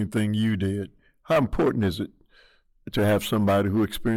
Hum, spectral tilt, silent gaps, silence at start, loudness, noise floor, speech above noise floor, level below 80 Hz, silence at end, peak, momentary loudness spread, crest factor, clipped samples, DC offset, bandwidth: none; -6.5 dB/octave; none; 0 s; -24 LUFS; -59 dBFS; 35 dB; -44 dBFS; 0 s; -12 dBFS; 11 LU; 12 dB; under 0.1%; under 0.1%; 18.5 kHz